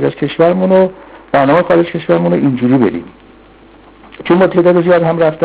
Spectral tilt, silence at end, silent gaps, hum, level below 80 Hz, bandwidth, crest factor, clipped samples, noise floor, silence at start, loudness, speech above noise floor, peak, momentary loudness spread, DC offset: -11.5 dB/octave; 0 s; none; none; -46 dBFS; 4 kHz; 12 dB; under 0.1%; -41 dBFS; 0 s; -11 LUFS; 30 dB; 0 dBFS; 7 LU; under 0.1%